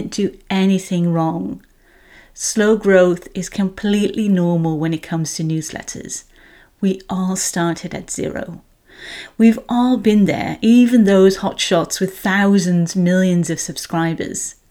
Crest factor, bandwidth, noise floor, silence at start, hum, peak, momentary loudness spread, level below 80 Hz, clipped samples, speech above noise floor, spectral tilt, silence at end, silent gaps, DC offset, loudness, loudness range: 16 dB; 16.5 kHz; -49 dBFS; 0 s; none; 0 dBFS; 14 LU; -48 dBFS; under 0.1%; 32 dB; -5.5 dB/octave; 0.2 s; none; under 0.1%; -17 LUFS; 8 LU